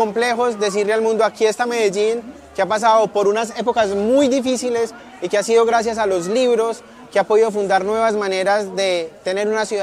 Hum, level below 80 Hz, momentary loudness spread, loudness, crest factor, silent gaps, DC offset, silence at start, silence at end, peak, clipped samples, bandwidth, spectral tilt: none; -58 dBFS; 7 LU; -18 LUFS; 14 dB; none; under 0.1%; 0 s; 0 s; -4 dBFS; under 0.1%; 13.5 kHz; -3.5 dB/octave